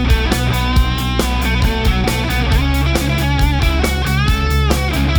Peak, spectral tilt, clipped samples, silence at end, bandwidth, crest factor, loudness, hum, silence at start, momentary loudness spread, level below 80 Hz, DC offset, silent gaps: 0 dBFS; -5 dB/octave; under 0.1%; 0 s; over 20 kHz; 14 dB; -16 LUFS; none; 0 s; 2 LU; -18 dBFS; under 0.1%; none